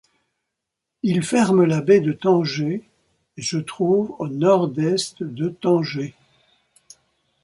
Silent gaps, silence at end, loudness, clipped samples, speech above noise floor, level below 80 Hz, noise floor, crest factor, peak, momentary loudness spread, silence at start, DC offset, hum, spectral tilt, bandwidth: none; 1.35 s; -20 LUFS; under 0.1%; 62 dB; -64 dBFS; -82 dBFS; 18 dB; -4 dBFS; 11 LU; 1.05 s; under 0.1%; none; -6 dB/octave; 11.5 kHz